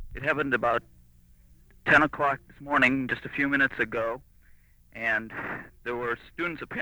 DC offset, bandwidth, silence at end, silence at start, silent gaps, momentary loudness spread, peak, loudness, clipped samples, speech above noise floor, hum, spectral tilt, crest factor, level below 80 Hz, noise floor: under 0.1%; over 20 kHz; 0 s; 0 s; none; 14 LU; -8 dBFS; -27 LUFS; under 0.1%; 29 dB; none; -6 dB/octave; 20 dB; -52 dBFS; -56 dBFS